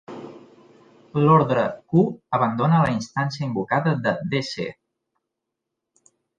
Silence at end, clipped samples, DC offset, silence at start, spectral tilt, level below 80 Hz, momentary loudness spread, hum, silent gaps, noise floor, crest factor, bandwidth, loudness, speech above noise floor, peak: 1.65 s; under 0.1%; under 0.1%; 0.1 s; -7.5 dB/octave; -60 dBFS; 14 LU; none; none; -82 dBFS; 18 dB; 7.6 kHz; -22 LUFS; 62 dB; -4 dBFS